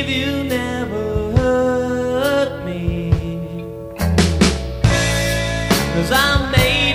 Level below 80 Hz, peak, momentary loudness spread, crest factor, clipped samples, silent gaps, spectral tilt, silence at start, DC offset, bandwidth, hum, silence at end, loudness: -28 dBFS; -2 dBFS; 8 LU; 16 dB; under 0.1%; none; -5 dB/octave; 0 s; under 0.1%; 16.5 kHz; none; 0 s; -18 LUFS